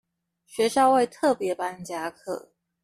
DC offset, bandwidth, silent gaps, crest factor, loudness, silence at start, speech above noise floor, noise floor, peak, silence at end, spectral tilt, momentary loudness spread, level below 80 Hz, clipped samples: under 0.1%; 14.5 kHz; none; 18 dB; -24 LUFS; 0.55 s; 38 dB; -62 dBFS; -8 dBFS; 0.45 s; -4 dB/octave; 16 LU; -68 dBFS; under 0.1%